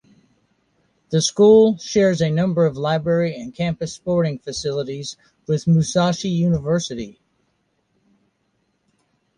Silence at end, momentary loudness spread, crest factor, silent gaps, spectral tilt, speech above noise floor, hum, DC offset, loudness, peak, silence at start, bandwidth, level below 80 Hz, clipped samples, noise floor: 2.25 s; 14 LU; 18 dB; none; -6 dB/octave; 50 dB; none; under 0.1%; -19 LUFS; -4 dBFS; 1.1 s; 10.5 kHz; -52 dBFS; under 0.1%; -68 dBFS